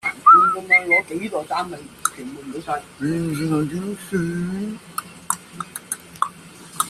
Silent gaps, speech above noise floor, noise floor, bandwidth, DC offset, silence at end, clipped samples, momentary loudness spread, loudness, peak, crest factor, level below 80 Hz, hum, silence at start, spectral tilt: none; 18 dB; -41 dBFS; 15 kHz; under 0.1%; 0 s; under 0.1%; 19 LU; -20 LUFS; 0 dBFS; 20 dB; -56 dBFS; none; 0.05 s; -4.5 dB/octave